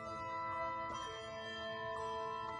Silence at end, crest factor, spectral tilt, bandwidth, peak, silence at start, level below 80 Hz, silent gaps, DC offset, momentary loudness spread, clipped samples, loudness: 0 s; 12 dB; -4 dB/octave; 10.5 kHz; -30 dBFS; 0 s; -66 dBFS; none; under 0.1%; 4 LU; under 0.1%; -43 LUFS